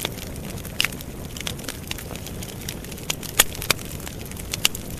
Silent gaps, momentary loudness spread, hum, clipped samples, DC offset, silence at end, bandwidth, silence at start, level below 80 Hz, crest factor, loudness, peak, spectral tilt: none; 14 LU; none; under 0.1%; under 0.1%; 0 s; 14.5 kHz; 0 s; -40 dBFS; 28 dB; -26 LUFS; 0 dBFS; -2 dB/octave